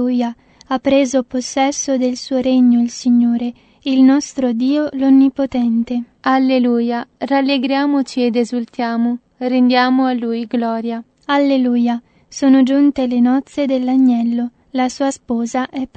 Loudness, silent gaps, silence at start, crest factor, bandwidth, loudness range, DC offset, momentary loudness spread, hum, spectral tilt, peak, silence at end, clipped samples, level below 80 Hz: -16 LUFS; none; 0 s; 14 dB; 8.8 kHz; 2 LU; under 0.1%; 9 LU; none; -4 dB/octave; 0 dBFS; 0.1 s; under 0.1%; -56 dBFS